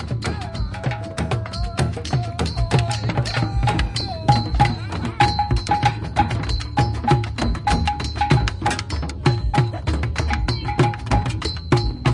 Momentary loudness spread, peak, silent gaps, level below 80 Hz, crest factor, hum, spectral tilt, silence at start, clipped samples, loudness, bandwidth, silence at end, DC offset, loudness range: 7 LU; -2 dBFS; none; -28 dBFS; 18 dB; none; -6 dB/octave; 0 s; under 0.1%; -22 LUFS; 11.5 kHz; 0 s; under 0.1%; 2 LU